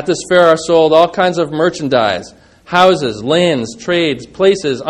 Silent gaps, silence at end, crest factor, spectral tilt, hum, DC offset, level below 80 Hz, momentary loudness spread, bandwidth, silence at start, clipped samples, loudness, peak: none; 0 s; 12 dB; -5 dB/octave; none; under 0.1%; -50 dBFS; 7 LU; 11.5 kHz; 0 s; 0.3%; -13 LUFS; 0 dBFS